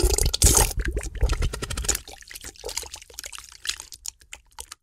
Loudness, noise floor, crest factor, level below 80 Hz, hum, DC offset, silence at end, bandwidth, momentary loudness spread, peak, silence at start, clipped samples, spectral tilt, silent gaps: -24 LUFS; -47 dBFS; 22 dB; -28 dBFS; none; under 0.1%; 0.2 s; 16.5 kHz; 22 LU; -4 dBFS; 0 s; under 0.1%; -2.5 dB/octave; none